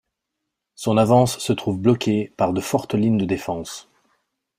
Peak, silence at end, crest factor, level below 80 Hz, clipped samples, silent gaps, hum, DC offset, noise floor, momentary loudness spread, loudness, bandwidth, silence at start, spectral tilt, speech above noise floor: -2 dBFS; 0.8 s; 18 dB; -56 dBFS; under 0.1%; none; none; under 0.1%; -81 dBFS; 12 LU; -21 LUFS; 16 kHz; 0.8 s; -6 dB/octave; 61 dB